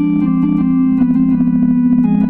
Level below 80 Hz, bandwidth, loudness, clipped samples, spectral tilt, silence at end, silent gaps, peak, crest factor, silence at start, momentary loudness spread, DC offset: -38 dBFS; 3.1 kHz; -13 LUFS; under 0.1%; -12 dB/octave; 0 s; none; -4 dBFS; 8 dB; 0 s; 2 LU; under 0.1%